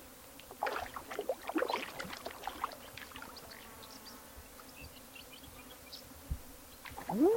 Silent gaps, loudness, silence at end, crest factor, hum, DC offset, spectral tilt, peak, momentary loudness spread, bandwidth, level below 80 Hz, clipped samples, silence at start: none; -43 LUFS; 0 s; 22 dB; none; under 0.1%; -4.5 dB/octave; -18 dBFS; 14 LU; 17 kHz; -56 dBFS; under 0.1%; 0 s